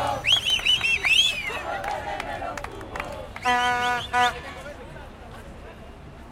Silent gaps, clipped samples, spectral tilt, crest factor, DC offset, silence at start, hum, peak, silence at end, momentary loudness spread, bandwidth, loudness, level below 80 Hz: none; under 0.1%; -1.5 dB/octave; 18 dB; under 0.1%; 0 s; none; -8 dBFS; 0 s; 24 LU; 16.5 kHz; -22 LUFS; -46 dBFS